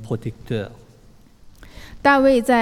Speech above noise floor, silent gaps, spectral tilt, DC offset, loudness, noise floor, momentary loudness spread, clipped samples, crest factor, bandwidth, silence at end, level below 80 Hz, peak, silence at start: 31 dB; none; -6 dB/octave; under 0.1%; -19 LUFS; -49 dBFS; 14 LU; under 0.1%; 18 dB; 15.5 kHz; 0 s; -46 dBFS; -2 dBFS; 0 s